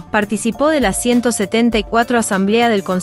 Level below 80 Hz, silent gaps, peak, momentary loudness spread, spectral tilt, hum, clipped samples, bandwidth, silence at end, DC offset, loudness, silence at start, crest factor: -38 dBFS; none; -2 dBFS; 3 LU; -4 dB/octave; none; under 0.1%; 15.5 kHz; 0 s; under 0.1%; -15 LUFS; 0 s; 14 dB